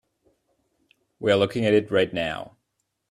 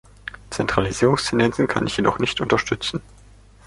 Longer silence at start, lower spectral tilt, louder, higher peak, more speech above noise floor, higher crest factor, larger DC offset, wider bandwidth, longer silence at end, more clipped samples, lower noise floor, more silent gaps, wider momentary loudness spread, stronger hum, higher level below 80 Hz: first, 1.2 s vs 0.25 s; about the same, -6 dB/octave vs -5 dB/octave; about the same, -23 LUFS vs -21 LUFS; second, -6 dBFS vs -2 dBFS; first, 55 dB vs 27 dB; about the same, 20 dB vs 20 dB; neither; about the same, 12.5 kHz vs 11.5 kHz; about the same, 0.65 s vs 0.65 s; neither; first, -77 dBFS vs -48 dBFS; neither; about the same, 12 LU vs 13 LU; neither; second, -60 dBFS vs -44 dBFS